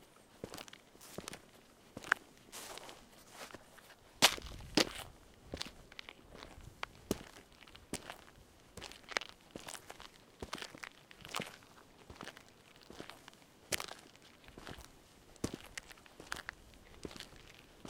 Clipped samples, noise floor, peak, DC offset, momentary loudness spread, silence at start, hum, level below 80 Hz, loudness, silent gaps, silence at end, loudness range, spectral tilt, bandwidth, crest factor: under 0.1%; -62 dBFS; -6 dBFS; under 0.1%; 22 LU; 0 s; none; -64 dBFS; -41 LUFS; none; 0 s; 12 LU; -2 dB/octave; 17.5 kHz; 38 dB